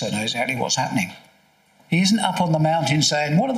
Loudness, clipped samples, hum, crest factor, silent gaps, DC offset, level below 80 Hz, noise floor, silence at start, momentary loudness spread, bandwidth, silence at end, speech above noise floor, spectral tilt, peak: -20 LUFS; under 0.1%; none; 18 dB; none; under 0.1%; -62 dBFS; -58 dBFS; 0 s; 6 LU; 15.5 kHz; 0 s; 38 dB; -4.5 dB/octave; -2 dBFS